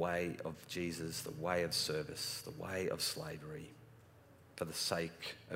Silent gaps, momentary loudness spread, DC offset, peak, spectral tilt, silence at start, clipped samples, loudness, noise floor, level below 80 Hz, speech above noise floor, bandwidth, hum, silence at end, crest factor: none; 12 LU; under 0.1%; -20 dBFS; -3.5 dB/octave; 0 s; under 0.1%; -40 LUFS; -62 dBFS; -68 dBFS; 22 dB; 16 kHz; none; 0 s; 22 dB